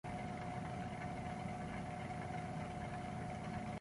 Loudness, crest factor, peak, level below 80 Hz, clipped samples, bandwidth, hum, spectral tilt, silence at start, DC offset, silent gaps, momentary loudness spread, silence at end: -45 LUFS; 12 dB; -32 dBFS; -58 dBFS; under 0.1%; 11.5 kHz; none; -6.5 dB/octave; 0.05 s; under 0.1%; none; 1 LU; 0 s